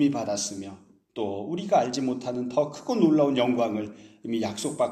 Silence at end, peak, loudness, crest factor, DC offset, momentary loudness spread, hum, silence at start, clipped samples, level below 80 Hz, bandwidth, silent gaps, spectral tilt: 0 s; -10 dBFS; -26 LUFS; 18 dB; under 0.1%; 15 LU; none; 0 s; under 0.1%; -70 dBFS; 13.5 kHz; none; -5 dB/octave